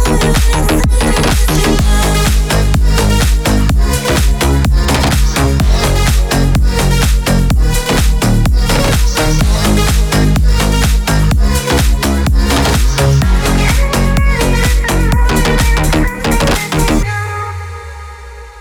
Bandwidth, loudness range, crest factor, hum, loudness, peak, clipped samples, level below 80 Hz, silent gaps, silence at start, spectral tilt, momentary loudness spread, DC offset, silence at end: 18 kHz; 1 LU; 10 dB; none; -12 LUFS; 0 dBFS; under 0.1%; -12 dBFS; none; 0 s; -5 dB/octave; 2 LU; 0.3%; 0 s